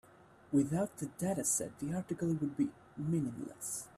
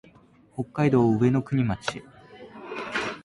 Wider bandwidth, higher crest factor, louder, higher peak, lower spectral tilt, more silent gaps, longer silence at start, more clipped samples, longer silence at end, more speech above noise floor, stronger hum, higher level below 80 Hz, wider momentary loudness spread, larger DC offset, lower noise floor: first, 15 kHz vs 11 kHz; about the same, 16 dB vs 16 dB; second, -36 LUFS vs -25 LUFS; second, -20 dBFS vs -10 dBFS; about the same, -6 dB/octave vs -7 dB/octave; neither; second, 0.2 s vs 0.55 s; neither; about the same, 0.1 s vs 0.05 s; second, 24 dB vs 32 dB; neither; second, -68 dBFS vs -54 dBFS; second, 8 LU vs 21 LU; neither; first, -60 dBFS vs -55 dBFS